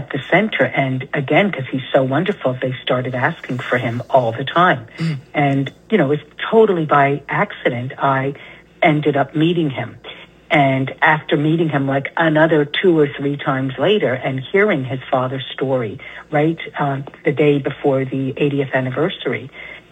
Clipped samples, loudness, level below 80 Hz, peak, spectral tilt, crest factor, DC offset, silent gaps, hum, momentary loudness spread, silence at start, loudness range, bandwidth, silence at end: under 0.1%; -18 LUFS; -56 dBFS; 0 dBFS; -8 dB/octave; 16 dB; under 0.1%; none; none; 8 LU; 0 s; 3 LU; 8.8 kHz; 0.1 s